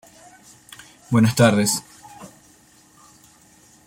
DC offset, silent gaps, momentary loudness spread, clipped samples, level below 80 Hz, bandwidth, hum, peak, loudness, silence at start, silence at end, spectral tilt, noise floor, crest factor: under 0.1%; none; 27 LU; under 0.1%; -58 dBFS; 16.5 kHz; none; -2 dBFS; -18 LUFS; 1.1 s; 1.6 s; -5 dB/octave; -53 dBFS; 20 dB